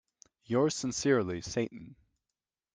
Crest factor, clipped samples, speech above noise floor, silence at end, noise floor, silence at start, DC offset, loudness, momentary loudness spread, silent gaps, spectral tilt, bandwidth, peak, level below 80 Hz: 20 dB; under 0.1%; over 59 dB; 0.85 s; under -90 dBFS; 0.5 s; under 0.1%; -31 LUFS; 9 LU; none; -4.5 dB/octave; 10 kHz; -14 dBFS; -64 dBFS